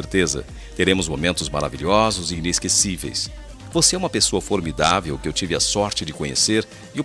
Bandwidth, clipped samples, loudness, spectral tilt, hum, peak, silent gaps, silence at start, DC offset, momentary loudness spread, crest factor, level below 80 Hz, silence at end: 14 kHz; under 0.1%; -20 LUFS; -3 dB/octave; none; 0 dBFS; none; 0 s; under 0.1%; 9 LU; 20 dB; -38 dBFS; 0 s